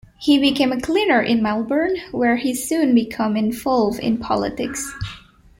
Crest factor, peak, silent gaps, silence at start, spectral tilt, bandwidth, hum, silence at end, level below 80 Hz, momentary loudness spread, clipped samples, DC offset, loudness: 16 dB; -2 dBFS; none; 0.2 s; -4.5 dB/octave; 16.5 kHz; none; 0.4 s; -48 dBFS; 9 LU; under 0.1%; under 0.1%; -19 LUFS